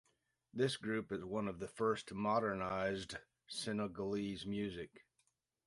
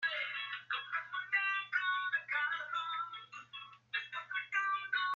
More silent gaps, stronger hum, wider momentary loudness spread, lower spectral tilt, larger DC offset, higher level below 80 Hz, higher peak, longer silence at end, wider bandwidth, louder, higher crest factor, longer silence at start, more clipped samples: neither; neither; about the same, 11 LU vs 12 LU; first, -5 dB/octave vs 4.5 dB/octave; neither; first, -68 dBFS vs under -90 dBFS; about the same, -24 dBFS vs -22 dBFS; first, 0.7 s vs 0 s; first, 11.5 kHz vs 7.2 kHz; second, -40 LUFS vs -36 LUFS; about the same, 18 dB vs 18 dB; first, 0.55 s vs 0 s; neither